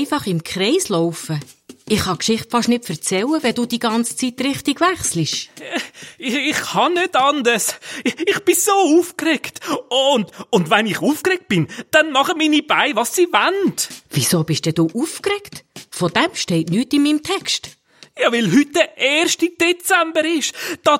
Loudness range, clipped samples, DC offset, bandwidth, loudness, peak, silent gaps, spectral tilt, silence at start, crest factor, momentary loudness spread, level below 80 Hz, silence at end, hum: 3 LU; under 0.1%; under 0.1%; 16.5 kHz; -18 LUFS; 0 dBFS; none; -3.5 dB/octave; 0 s; 18 dB; 8 LU; -56 dBFS; 0 s; none